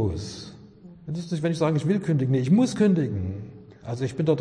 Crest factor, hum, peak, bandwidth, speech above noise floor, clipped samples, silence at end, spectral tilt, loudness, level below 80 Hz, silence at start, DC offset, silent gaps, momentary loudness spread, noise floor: 16 dB; none; -10 dBFS; 10.5 kHz; 24 dB; under 0.1%; 0 s; -7.5 dB/octave; -24 LUFS; -52 dBFS; 0 s; under 0.1%; none; 19 LU; -47 dBFS